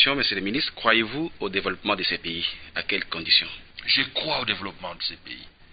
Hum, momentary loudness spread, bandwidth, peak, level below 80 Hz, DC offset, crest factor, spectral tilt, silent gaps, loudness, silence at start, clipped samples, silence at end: none; 12 LU; 5.2 kHz; -2 dBFS; -52 dBFS; under 0.1%; 24 dB; -8 dB/octave; none; -24 LUFS; 0 s; under 0.1%; 0.1 s